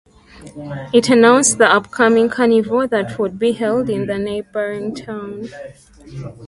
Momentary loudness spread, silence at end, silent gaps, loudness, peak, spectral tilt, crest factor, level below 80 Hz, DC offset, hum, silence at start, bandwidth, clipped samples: 20 LU; 0 s; none; -15 LUFS; 0 dBFS; -4 dB/octave; 16 dB; -52 dBFS; under 0.1%; none; 0.35 s; 11.5 kHz; under 0.1%